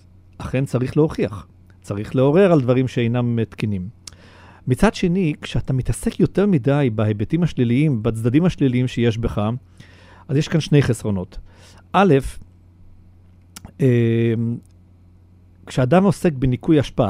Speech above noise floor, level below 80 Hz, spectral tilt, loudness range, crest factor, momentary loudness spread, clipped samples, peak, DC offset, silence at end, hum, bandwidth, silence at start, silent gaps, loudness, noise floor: 30 dB; -38 dBFS; -7.5 dB/octave; 3 LU; 18 dB; 12 LU; under 0.1%; 0 dBFS; under 0.1%; 0 s; none; 13 kHz; 0.4 s; none; -19 LUFS; -49 dBFS